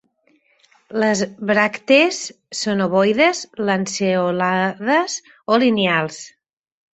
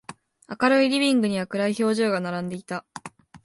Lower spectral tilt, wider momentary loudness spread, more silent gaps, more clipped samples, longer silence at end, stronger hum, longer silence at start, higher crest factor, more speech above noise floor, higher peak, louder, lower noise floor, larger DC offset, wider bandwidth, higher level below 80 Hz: about the same, -4 dB/octave vs -5 dB/octave; second, 12 LU vs 22 LU; neither; neither; first, 0.65 s vs 0.1 s; neither; first, 0.9 s vs 0.1 s; about the same, 18 dB vs 18 dB; first, 43 dB vs 20 dB; first, -2 dBFS vs -6 dBFS; first, -18 LUFS vs -23 LUFS; first, -61 dBFS vs -42 dBFS; neither; second, 8.2 kHz vs 11.5 kHz; first, -62 dBFS vs -68 dBFS